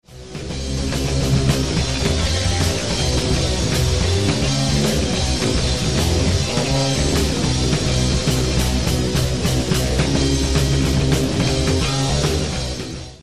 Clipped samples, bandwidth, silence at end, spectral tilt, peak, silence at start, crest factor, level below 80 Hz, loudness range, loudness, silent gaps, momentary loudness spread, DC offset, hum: under 0.1%; 15 kHz; 0 s; -4.5 dB/octave; -4 dBFS; 0 s; 14 dB; -26 dBFS; 1 LU; -19 LUFS; none; 4 LU; 1%; none